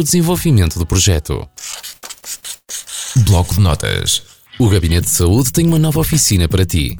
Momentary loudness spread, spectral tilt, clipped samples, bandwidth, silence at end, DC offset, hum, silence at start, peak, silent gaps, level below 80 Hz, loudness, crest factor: 14 LU; -4.5 dB/octave; under 0.1%; over 20 kHz; 0 s; under 0.1%; none; 0 s; -2 dBFS; none; -26 dBFS; -14 LUFS; 12 dB